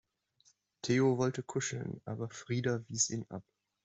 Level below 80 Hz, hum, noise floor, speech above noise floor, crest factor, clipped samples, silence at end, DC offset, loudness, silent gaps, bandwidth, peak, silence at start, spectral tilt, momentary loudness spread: -72 dBFS; none; -71 dBFS; 37 dB; 20 dB; under 0.1%; 0.45 s; under 0.1%; -34 LUFS; none; 8.2 kHz; -16 dBFS; 0.85 s; -4.5 dB/octave; 12 LU